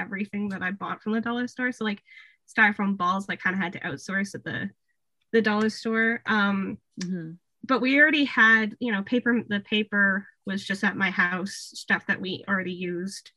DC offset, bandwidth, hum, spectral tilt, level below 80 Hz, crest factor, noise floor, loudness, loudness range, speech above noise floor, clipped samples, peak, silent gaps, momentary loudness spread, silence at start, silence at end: under 0.1%; 12 kHz; none; -5 dB/octave; -72 dBFS; 20 dB; -78 dBFS; -25 LUFS; 5 LU; 52 dB; under 0.1%; -6 dBFS; none; 15 LU; 0 s; 0.1 s